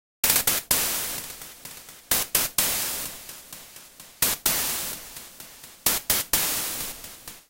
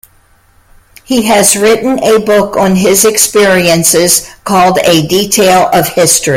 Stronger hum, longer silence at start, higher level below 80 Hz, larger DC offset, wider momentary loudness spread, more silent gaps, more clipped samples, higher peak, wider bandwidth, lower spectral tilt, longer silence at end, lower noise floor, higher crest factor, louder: neither; second, 0.25 s vs 1.1 s; second, -52 dBFS vs -40 dBFS; neither; first, 20 LU vs 4 LU; neither; second, under 0.1% vs 0.4%; about the same, -2 dBFS vs 0 dBFS; second, 17 kHz vs over 20 kHz; second, 0 dB/octave vs -3 dB/octave; about the same, 0.1 s vs 0 s; about the same, -47 dBFS vs -47 dBFS; first, 26 dB vs 8 dB; second, -23 LUFS vs -7 LUFS